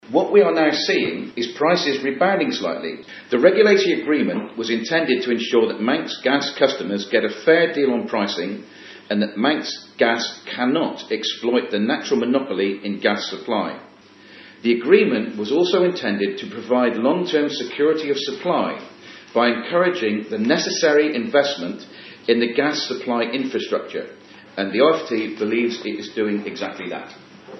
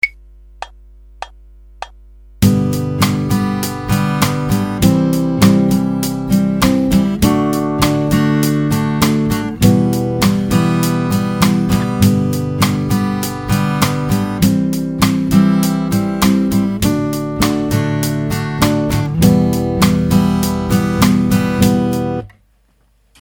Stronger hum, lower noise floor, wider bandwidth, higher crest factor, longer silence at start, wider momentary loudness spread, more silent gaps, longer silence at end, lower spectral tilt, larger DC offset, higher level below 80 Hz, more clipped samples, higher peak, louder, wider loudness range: neither; second, -46 dBFS vs -55 dBFS; second, 6.2 kHz vs 18 kHz; first, 20 dB vs 14 dB; about the same, 0.05 s vs 0.05 s; first, 12 LU vs 6 LU; neither; second, 0 s vs 0.95 s; second, -4.5 dB/octave vs -6 dB/octave; neither; second, -76 dBFS vs -32 dBFS; neither; about the same, 0 dBFS vs 0 dBFS; second, -20 LUFS vs -15 LUFS; about the same, 4 LU vs 2 LU